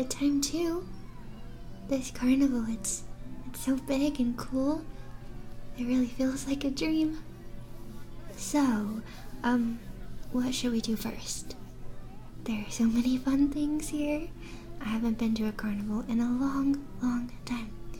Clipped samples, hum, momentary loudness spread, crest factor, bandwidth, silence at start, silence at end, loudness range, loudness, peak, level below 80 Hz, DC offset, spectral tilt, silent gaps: under 0.1%; none; 20 LU; 16 dB; 17.5 kHz; 0 s; 0 s; 3 LU; -31 LUFS; -16 dBFS; -44 dBFS; under 0.1%; -4.5 dB/octave; none